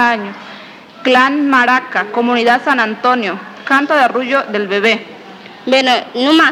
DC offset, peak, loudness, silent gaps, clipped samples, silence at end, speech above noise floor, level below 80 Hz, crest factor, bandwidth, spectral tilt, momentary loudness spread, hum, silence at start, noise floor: under 0.1%; 0 dBFS; -13 LUFS; none; 0.1%; 0 s; 22 dB; -70 dBFS; 14 dB; 16 kHz; -3.5 dB/octave; 16 LU; none; 0 s; -35 dBFS